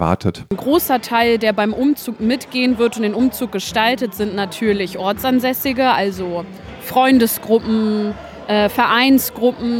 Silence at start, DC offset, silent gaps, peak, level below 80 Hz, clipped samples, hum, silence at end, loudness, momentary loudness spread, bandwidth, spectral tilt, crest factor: 0 s; under 0.1%; none; 0 dBFS; -46 dBFS; under 0.1%; none; 0 s; -17 LUFS; 9 LU; 17 kHz; -4.5 dB/octave; 16 dB